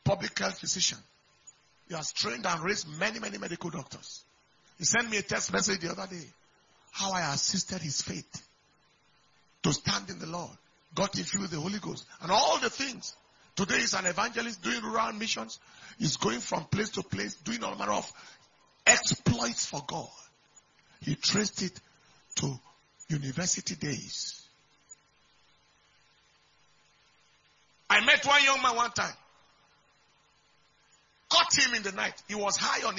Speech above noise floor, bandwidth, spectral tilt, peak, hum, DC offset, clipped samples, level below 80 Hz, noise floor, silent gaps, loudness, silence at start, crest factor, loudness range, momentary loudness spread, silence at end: 37 dB; 7.6 kHz; -2.5 dB/octave; -4 dBFS; none; under 0.1%; under 0.1%; -64 dBFS; -67 dBFS; none; -29 LUFS; 0.05 s; 28 dB; 8 LU; 18 LU; 0 s